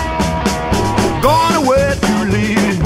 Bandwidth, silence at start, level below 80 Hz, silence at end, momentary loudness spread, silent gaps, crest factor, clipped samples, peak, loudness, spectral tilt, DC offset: 16 kHz; 0 s; -28 dBFS; 0 s; 4 LU; none; 12 dB; under 0.1%; 0 dBFS; -14 LUFS; -5.5 dB/octave; under 0.1%